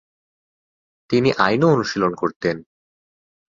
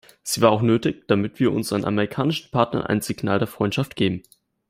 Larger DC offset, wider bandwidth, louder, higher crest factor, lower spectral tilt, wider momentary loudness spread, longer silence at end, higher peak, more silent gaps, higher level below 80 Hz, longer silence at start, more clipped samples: neither; second, 7.6 kHz vs 16 kHz; first, -19 LUFS vs -22 LUFS; about the same, 20 dB vs 20 dB; about the same, -6 dB/octave vs -5.5 dB/octave; about the same, 8 LU vs 6 LU; first, 0.9 s vs 0.5 s; about the same, -2 dBFS vs -2 dBFS; first, 2.36-2.40 s vs none; about the same, -56 dBFS vs -56 dBFS; first, 1.1 s vs 0.25 s; neither